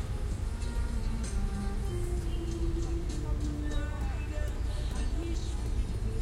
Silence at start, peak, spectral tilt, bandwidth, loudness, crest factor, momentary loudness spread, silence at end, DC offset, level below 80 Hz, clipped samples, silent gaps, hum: 0 s; -20 dBFS; -6 dB/octave; 12.5 kHz; -35 LUFS; 12 dB; 1 LU; 0 s; under 0.1%; -32 dBFS; under 0.1%; none; none